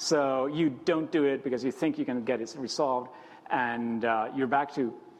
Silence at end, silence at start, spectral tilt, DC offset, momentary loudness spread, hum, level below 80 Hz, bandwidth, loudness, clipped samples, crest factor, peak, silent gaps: 0 s; 0 s; -5 dB/octave; under 0.1%; 6 LU; none; -72 dBFS; 12.5 kHz; -29 LUFS; under 0.1%; 16 dB; -12 dBFS; none